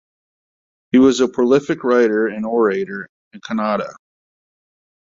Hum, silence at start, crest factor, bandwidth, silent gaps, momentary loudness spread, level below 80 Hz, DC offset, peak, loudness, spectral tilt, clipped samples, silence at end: none; 0.95 s; 16 dB; 7.8 kHz; 3.09-3.31 s; 17 LU; -60 dBFS; under 0.1%; -2 dBFS; -17 LUFS; -5.5 dB/octave; under 0.1%; 1.15 s